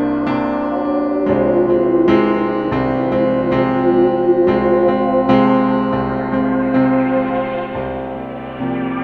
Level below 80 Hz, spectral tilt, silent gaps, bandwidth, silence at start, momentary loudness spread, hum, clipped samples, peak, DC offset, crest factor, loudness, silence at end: -42 dBFS; -9.5 dB/octave; none; 5.2 kHz; 0 s; 9 LU; none; under 0.1%; 0 dBFS; under 0.1%; 16 dB; -16 LUFS; 0 s